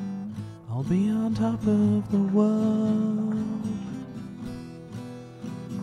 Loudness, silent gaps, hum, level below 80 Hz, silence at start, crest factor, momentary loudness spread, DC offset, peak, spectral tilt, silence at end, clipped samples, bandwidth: -26 LUFS; none; none; -56 dBFS; 0 s; 16 dB; 16 LU; under 0.1%; -12 dBFS; -8.5 dB/octave; 0 s; under 0.1%; 10 kHz